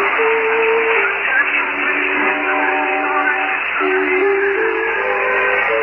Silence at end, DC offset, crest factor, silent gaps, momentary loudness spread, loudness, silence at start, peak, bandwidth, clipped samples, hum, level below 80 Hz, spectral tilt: 0 s; under 0.1%; 12 dB; none; 3 LU; -15 LUFS; 0 s; -4 dBFS; 5.4 kHz; under 0.1%; none; -52 dBFS; -5.5 dB/octave